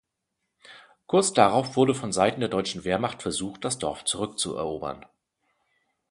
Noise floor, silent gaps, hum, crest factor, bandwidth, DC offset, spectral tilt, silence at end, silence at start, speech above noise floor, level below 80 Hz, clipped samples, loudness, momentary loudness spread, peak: -81 dBFS; none; none; 26 dB; 11.5 kHz; under 0.1%; -4 dB/octave; 1.1 s; 0.7 s; 56 dB; -58 dBFS; under 0.1%; -25 LUFS; 10 LU; -2 dBFS